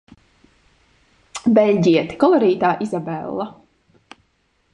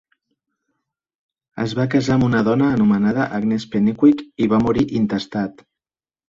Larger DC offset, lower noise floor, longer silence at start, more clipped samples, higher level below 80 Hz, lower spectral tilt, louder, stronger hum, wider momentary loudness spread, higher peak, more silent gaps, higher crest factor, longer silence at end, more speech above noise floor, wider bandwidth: neither; second, -64 dBFS vs under -90 dBFS; second, 1.35 s vs 1.55 s; neither; second, -60 dBFS vs -48 dBFS; about the same, -6.5 dB/octave vs -7.5 dB/octave; about the same, -18 LUFS vs -18 LUFS; neither; first, 13 LU vs 9 LU; about the same, -2 dBFS vs -4 dBFS; neither; about the same, 18 dB vs 16 dB; first, 1.2 s vs 0.8 s; second, 48 dB vs over 73 dB; first, 10.5 kHz vs 7.6 kHz